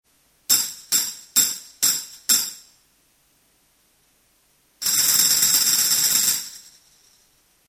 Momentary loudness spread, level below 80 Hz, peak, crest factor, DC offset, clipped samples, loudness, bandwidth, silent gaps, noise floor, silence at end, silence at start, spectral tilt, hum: 11 LU; -62 dBFS; -2 dBFS; 22 dB; under 0.1%; under 0.1%; -18 LUFS; 17.5 kHz; none; -62 dBFS; 1.1 s; 0.5 s; 2 dB/octave; none